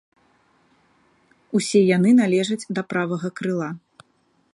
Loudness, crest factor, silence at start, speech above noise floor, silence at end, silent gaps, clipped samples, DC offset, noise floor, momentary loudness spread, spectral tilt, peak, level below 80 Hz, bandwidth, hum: -21 LUFS; 16 dB; 1.5 s; 45 dB; 0.75 s; none; under 0.1%; under 0.1%; -64 dBFS; 11 LU; -6 dB/octave; -6 dBFS; -70 dBFS; 11.5 kHz; none